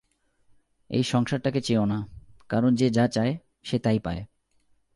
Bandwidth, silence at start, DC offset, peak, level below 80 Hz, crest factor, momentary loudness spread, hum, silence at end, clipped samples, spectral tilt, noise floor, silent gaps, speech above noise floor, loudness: 11.5 kHz; 0.9 s; under 0.1%; -10 dBFS; -52 dBFS; 16 dB; 11 LU; none; 0.7 s; under 0.1%; -6.5 dB/octave; -66 dBFS; none; 41 dB; -26 LUFS